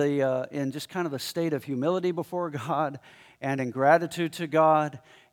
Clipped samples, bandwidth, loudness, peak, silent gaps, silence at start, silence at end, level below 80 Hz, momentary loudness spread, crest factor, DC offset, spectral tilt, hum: under 0.1%; 18 kHz; -27 LUFS; -6 dBFS; none; 0 s; 0.35 s; -76 dBFS; 10 LU; 20 dB; under 0.1%; -6 dB/octave; none